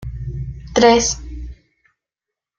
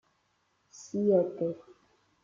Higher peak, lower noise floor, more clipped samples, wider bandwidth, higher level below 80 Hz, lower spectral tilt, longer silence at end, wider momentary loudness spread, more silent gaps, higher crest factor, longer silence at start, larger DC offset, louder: first, 0 dBFS vs -12 dBFS; first, -86 dBFS vs -74 dBFS; neither; first, 8.8 kHz vs 7.6 kHz; first, -34 dBFS vs -78 dBFS; second, -3.5 dB/octave vs -8 dB/octave; first, 1.05 s vs 0.65 s; about the same, 22 LU vs 20 LU; neither; about the same, 20 dB vs 20 dB; second, 0 s vs 0.75 s; neither; first, -16 LUFS vs -30 LUFS